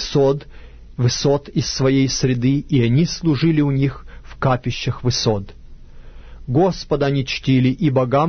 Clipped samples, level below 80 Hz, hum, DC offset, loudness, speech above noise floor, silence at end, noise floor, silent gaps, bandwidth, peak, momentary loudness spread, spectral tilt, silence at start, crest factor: under 0.1%; -38 dBFS; none; under 0.1%; -18 LUFS; 20 dB; 0 s; -37 dBFS; none; 6.6 kHz; -4 dBFS; 7 LU; -6 dB/octave; 0 s; 14 dB